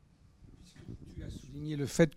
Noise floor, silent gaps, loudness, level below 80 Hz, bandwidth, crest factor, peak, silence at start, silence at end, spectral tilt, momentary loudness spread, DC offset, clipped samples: -59 dBFS; none; -37 LUFS; -54 dBFS; 16 kHz; 24 dB; -12 dBFS; 0.4 s; 0 s; -6 dB/octave; 23 LU; under 0.1%; under 0.1%